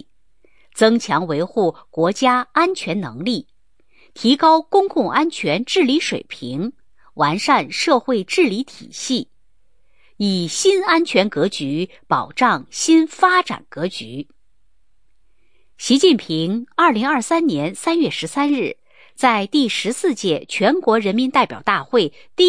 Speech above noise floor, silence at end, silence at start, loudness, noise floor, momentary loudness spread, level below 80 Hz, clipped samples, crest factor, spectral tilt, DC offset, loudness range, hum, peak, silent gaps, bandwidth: 49 dB; 0 s; 0.75 s; -18 LUFS; -67 dBFS; 11 LU; -64 dBFS; under 0.1%; 18 dB; -4 dB/octave; 0.3%; 3 LU; none; -2 dBFS; none; 10.5 kHz